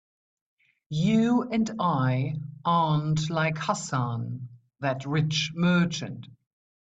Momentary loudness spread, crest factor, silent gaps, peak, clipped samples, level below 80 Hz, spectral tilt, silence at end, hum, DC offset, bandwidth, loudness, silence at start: 11 LU; 16 dB; none; -12 dBFS; under 0.1%; -60 dBFS; -6 dB/octave; 0.45 s; none; under 0.1%; 8.4 kHz; -26 LUFS; 0.9 s